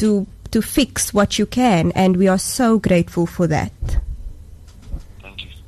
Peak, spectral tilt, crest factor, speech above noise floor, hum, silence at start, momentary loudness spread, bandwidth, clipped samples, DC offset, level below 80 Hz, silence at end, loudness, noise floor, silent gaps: -4 dBFS; -5 dB/octave; 14 dB; 23 dB; none; 0 s; 20 LU; 13 kHz; under 0.1%; under 0.1%; -32 dBFS; 0.05 s; -18 LUFS; -39 dBFS; none